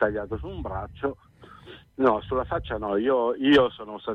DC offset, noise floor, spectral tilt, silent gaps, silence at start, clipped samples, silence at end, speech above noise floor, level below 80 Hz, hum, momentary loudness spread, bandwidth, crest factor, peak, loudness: under 0.1%; -48 dBFS; -7 dB/octave; none; 0 s; under 0.1%; 0 s; 23 dB; -46 dBFS; none; 14 LU; 6.8 kHz; 16 dB; -10 dBFS; -25 LUFS